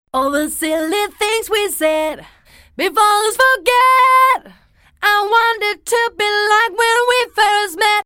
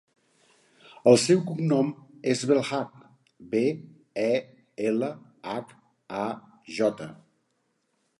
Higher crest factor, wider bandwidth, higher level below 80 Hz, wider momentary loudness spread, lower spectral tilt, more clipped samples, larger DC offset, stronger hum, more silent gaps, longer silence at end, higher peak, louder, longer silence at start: second, 14 dB vs 24 dB; first, over 20 kHz vs 11.5 kHz; first, -52 dBFS vs -72 dBFS; second, 8 LU vs 19 LU; second, -0.5 dB/octave vs -5.5 dB/octave; neither; neither; neither; neither; second, 0.05 s vs 1.05 s; about the same, -2 dBFS vs -4 dBFS; first, -14 LUFS vs -26 LUFS; second, 0.15 s vs 1.05 s